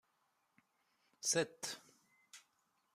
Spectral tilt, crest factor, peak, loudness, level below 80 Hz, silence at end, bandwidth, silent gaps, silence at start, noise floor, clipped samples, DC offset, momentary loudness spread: -2 dB/octave; 24 dB; -22 dBFS; -39 LUFS; -86 dBFS; 0.55 s; 15 kHz; none; 1.2 s; -81 dBFS; under 0.1%; under 0.1%; 24 LU